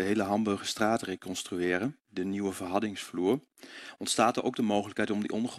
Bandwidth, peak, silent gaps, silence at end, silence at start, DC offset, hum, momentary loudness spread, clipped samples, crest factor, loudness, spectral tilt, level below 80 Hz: 13.5 kHz; -10 dBFS; none; 0 s; 0 s; under 0.1%; none; 9 LU; under 0.1%; 20 dB; -31 LUFS; -4.5 dB/octave; -68 dBFS